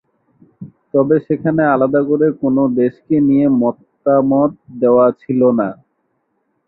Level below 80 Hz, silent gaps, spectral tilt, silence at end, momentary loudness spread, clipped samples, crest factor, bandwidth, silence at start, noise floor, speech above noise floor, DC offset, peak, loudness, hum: -56 dBFS; none; -13 dB/octave; 0.95 s; 7 LU; under 0.1%; 14 dB; 4 kHz; 0.6 s; -66 dBFS; 53 dB; under 0.1%; -2 dBFS; -15 LUFS; none